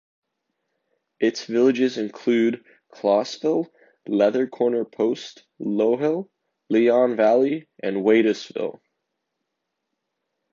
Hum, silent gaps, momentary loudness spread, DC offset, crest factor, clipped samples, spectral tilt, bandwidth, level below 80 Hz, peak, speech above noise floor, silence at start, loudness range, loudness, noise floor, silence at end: none; none; 13 LU; under 0.1%; 18 dB; under 0.1%; -6 dB/octave; 7.4 kHz; -74 dBFS; -6 dBFS; 59 dB; 1.2 s; 3 LU; -22 LUFS; -80 dBFS; 1.8 s